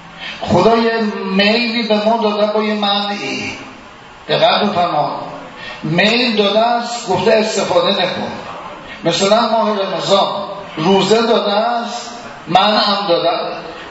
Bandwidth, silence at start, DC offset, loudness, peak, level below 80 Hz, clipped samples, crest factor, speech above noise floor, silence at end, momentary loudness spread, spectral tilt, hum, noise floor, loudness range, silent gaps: 8 kHz; 0 s; under 0.1%; -14 LUFS; 0 dBFS; -52 dBFS; under 0.1%; 16 dB; 23 dB; 0 s; 15 LU; -4.5 dB/octave; none; -37 dBFS; 2 LU; none